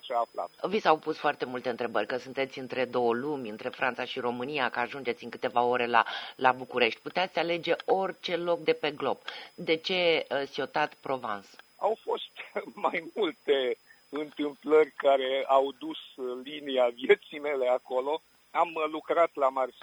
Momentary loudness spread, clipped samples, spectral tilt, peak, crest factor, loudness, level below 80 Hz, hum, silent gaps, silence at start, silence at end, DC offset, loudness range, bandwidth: 11 LU; under 0.1%; -5 dB/octave; -6 dBFS; 24 dB; -29 LUFS; -78 dBFS; none; none; 0.05 s; 0.15 s; under 0.1%; 4 LU; over 20 kHz